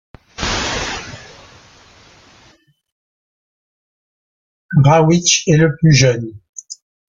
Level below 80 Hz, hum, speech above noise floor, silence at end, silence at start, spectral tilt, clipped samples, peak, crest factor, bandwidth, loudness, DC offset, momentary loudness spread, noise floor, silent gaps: -42 dBFS; none; 40 dB; 0.4 s; 0.4 s; -4.5 dB/octave; under 0.1%; 0 dBFS; 18 dB; 7.6 kHz; -14 LUFS; under 0.1%; 23 LU; -52 dBFS; 2.92-4.69 s, 6.49-6.53 s